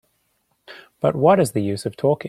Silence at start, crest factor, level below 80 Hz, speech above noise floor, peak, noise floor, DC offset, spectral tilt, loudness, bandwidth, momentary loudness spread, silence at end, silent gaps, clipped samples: 0.7 s; 18 dB; -58 dBFS; 50 dB; -2 dBFS; -68 dBFS; under 0.1%; -6.5 dB/octave; -19 LUFS; 15 kHz; 8 LU; 0 s; none; under 0.1%